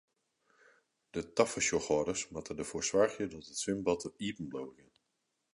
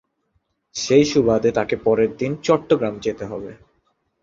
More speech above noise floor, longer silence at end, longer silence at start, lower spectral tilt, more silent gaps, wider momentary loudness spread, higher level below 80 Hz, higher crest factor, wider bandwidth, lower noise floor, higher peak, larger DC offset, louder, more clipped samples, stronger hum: about the same, 48 dB vs 50 dB; about the same, 0.8 s vs 0.7 s; first, 1.15 s vs 0.75 s; second, -3.5 dB/octave vs -5.5 dB/octave; neither; second, 12 LU vs 15 LU; second, -64 dBFS vs -52 dBFS; about the same, 22 dB vs 18 dB; first, 11.5 kHz vs 7.8 kHz; first, -83 dBFS vs -69 dBFS; second, -14 dBFS vs -2 dBFS; neither; second, -34 LUFS vs -19 LUFS; neither; neither